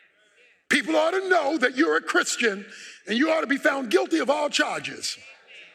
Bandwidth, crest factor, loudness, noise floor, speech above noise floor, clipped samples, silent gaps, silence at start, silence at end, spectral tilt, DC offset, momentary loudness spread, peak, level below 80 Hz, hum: 15.5 kHz; 16 dB; -23 LUFS; -59 dBFS; 36 dB; under 0.1%; none; 0.7 s; 0.1 s; -2 dB/octave; under 0.1%; 10 LU; -8 dBFS; -76 dBFS; none